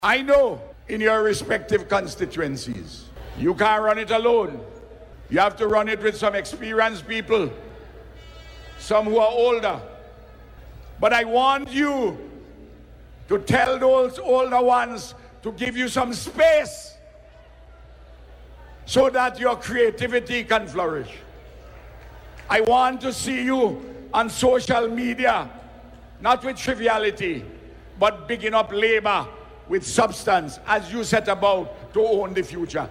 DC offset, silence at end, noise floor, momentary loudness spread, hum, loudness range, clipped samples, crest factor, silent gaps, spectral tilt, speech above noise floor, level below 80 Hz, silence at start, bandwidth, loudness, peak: under 0.1%; 0 s; -47 dBFS; 17 LU; none; 3 LU; under 0.1%; 18 dB; none; -4 dB/octave; 26 dB; -46 dBFS; 0 s; 16 kHz; -21 LUFS; -6 dBFS